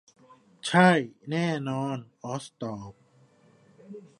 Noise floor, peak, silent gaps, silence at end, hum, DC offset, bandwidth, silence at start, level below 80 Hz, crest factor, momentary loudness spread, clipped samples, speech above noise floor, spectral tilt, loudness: -60 dBFS; -6 dBFS; none; 0.2 s; none; under 0.1%; 11.5 kHz; 0.65 s; -70 dBFS; 24 dB; 23 LU; under 0.1%; 34 dB; -6 dB/octave; -27 LUFS